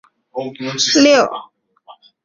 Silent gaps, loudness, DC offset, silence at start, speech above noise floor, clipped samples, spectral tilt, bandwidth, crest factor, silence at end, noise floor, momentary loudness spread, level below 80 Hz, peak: none; -14 LUFS; under 0.1%; 0.35 s; 31 dB; under 0.1%; -2.5 dB/octave; 7.6 kHz; 16 dB; 0.3 s; -46 dBFS; 19 LU; -60 dBFS; 0 dBFS